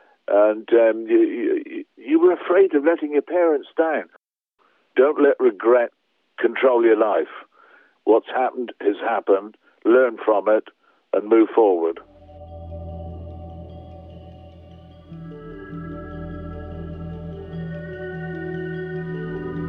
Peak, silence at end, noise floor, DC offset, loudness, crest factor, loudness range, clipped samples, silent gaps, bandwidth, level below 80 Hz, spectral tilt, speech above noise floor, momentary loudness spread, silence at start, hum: -4 dBFS; 0 s; -66 dBFS; under 0.1%; -20 LUFS; 18 dB; 18 LU; under 0.1%; none; 3.8 kHz; -48 dBFS; -10.5 dB/octave; 48 dB; 20 LU; 0.3 s; none